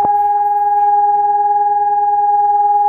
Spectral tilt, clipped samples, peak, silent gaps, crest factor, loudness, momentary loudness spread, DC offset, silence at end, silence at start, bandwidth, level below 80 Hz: -8 dB/octave; under 0.1%; -4 dBFS; none; 8 dB; -13 LUFS; 2 LU; under 0.1%; 0 s; 0 s; 2.6 kHz; -56 dBFS